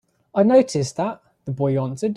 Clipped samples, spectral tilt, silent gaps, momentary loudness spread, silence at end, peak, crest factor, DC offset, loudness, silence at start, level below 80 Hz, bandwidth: under 0.1%; -7 dB/octave; none; 13 LU; 0 s; -4 dBFS; 16 dB; under 0.1%; -20 LUFS; 0.35 s; -60 dBFS; 11.5 kHz